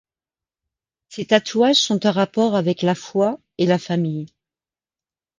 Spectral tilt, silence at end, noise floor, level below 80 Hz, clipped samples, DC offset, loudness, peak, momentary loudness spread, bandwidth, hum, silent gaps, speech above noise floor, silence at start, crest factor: -5 dB/octave; 1.1 s; under -90 dBFS; -66 dBFS; under 0.1%; under 0.1%; -19 LUFS; -2 dBFS; 13 LU; 9.8 kHz; none; none; over 71 dB; 1.1 s; 18 dB